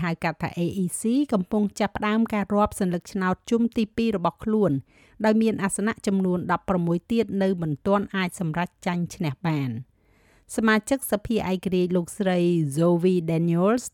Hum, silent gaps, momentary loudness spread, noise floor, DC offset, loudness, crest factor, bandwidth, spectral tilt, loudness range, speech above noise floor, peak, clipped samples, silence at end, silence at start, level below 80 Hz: none; none; 6 LU; -60 dBFS; under 0.1%; -24 LUFS; 14 dB; 17 kHz; -6 dB/octave; 3 LU; 36 dB; -10 dBFS; under 0.1%; 0.05 s; 0 s; -52 dBFS